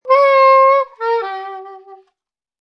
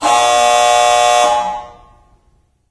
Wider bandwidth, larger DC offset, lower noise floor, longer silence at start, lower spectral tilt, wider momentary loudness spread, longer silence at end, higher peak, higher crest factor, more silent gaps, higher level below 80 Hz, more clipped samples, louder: second, 6 kHz vs 11 kHz; neither; first, -75 dBFS vs -56 dBFS; about the same, 0.05 s vs 0 s; about the same, -1 dB/octave vs 0 dB/octave; first, 20 LU vs 10 LU; second, 0.7 s vs 1 s; about the same, 0 dBFS vs 0 dBFS; about the same, 14 dB vs 14 dB; neither; second, -80 dBFS vs -48 dBFS; neither; about the same, -12 LUFS vs -11 LUFS